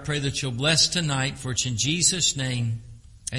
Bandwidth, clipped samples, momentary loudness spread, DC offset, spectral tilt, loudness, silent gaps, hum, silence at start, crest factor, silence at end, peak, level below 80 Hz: 11.5 kHz; under 0.1%; 10 LU; under 0.1%; -2.5 dB/octave; -23 LUFS; none; none; 0 s; 18 dB; 0 s; -6 dBFS; -48 dBFS